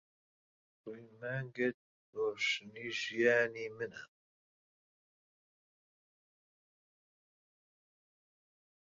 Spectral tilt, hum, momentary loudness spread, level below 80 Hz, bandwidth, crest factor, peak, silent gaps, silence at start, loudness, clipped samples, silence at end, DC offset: -2.5 dB/octave; none; 21 LU; -82 dBFS; 7.4 kHz; 24 dB; -18 dBFS; 1.74-2.13 s; 0.85 s; -36 LUFS; under 0.1%; 4.85 s; under 0.1%